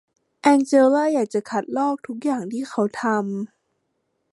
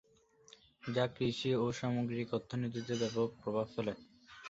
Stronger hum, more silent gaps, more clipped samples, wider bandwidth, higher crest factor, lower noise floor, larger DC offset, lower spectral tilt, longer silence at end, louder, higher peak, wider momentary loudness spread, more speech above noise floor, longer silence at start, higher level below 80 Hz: neither; neither; neither; first, 11.5 kHz vs 8 kHz; about the same, 18 dB vs 18 dB; first, -73 dBFS vs -66 dBFS; neither; about the same, -5.5 dB/octave vs -5.5 dB/octave; first, 0.85 s vs 0 s; first, -21 LUFS vs -37 LUFS; first, -4 dBFS vs -18 dBFS; first, 11 LU vs 7 LU; first, 53 dB vs 30 dB; second, 0.45 s vs 0.85 s; second, -74 dBFS vs -68 dBFS